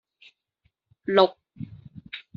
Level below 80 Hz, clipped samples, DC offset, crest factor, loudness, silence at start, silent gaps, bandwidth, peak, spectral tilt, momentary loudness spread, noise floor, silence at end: -66 dBFS; under 0.1%; under 0.1%; 26 dB; -22 LUFS; 1.1 s; none; 6.4 kHz; -4 dBFS; -3 dB/octave; 21 LU; -72 dBFS; 0.15 s